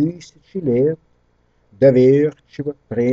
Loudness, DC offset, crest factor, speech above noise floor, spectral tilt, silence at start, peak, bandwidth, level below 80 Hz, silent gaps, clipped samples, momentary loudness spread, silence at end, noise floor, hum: -17 LUFS; under 0.1%; 18 dB; 43 dB; -9 dB/octave; 0 s; 0 dBFS; 7.4 kHz; -54 dBFS; none; under 0.1%; 18 LU; 0 s; -60 dBFS; 60 Hz at -50 dBFS